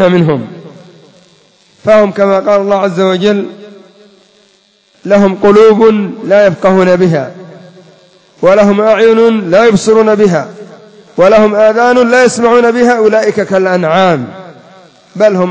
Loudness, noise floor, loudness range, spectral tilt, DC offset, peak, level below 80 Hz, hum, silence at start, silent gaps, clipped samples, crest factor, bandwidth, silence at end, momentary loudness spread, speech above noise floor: -8 LUFS; -49 dBFS; 4 LU; -6 dB/octave; under 0.1%; 0 dBFS; -48 dBFS; none; 0 s; none; 2%; 8 dB; 8 kHz; 0 s; 10 LU; 42 dB